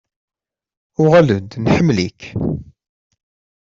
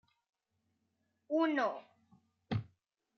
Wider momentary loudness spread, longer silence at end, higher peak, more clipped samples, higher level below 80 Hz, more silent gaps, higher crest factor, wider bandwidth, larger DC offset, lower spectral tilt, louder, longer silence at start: first, 13 LU vs 9 LU; first, 1 s vs 0.55 s; first, -2 dBFS vs -22 dBFS; neither; first, -44 dBFS vs -72 dBFS; neither; about the same, 16 dB vs 18 dB; first, 7.6 kHz vs 6.4 kHz; neither; about the same, -7.5 dB/octave vs -7.5 dB/octave; first, -16 LUFS vs -36 LUFS; second, 1 s vs 1.3 s